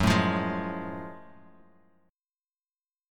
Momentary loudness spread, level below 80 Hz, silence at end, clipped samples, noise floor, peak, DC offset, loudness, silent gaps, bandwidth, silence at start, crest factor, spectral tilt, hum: 20 LU; -48 dBFS; 1.8 s; under 0.1%; under -90 dBFS; -10 dBFS; under 0.1%; -29 LUFS; none; 17 kHz; 0 s; 22 dB; -6 dB/octave; none